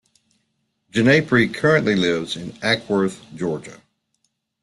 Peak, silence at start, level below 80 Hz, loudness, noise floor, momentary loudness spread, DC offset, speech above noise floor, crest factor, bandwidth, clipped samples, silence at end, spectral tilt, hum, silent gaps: -2 dBFS; 0.95 s; -56 dBFS; -19 LUFS; -71 dBFS; 11 LU; under 0.1%; 52 dB; 20 dB; 12 kHz; under 0.1%; 0.85 s; -5.5 dB/octave; none; none